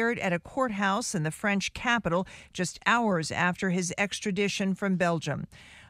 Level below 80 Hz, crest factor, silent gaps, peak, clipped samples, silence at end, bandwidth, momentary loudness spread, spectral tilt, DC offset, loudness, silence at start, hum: -58 dBFS; 22 dB; none; -6 dBFS; under 0.1%; 0.05 s; 15 kHz; 7 LU; -4.5 dB/octave; under 0.1%; -28 LUFS; 0 s; none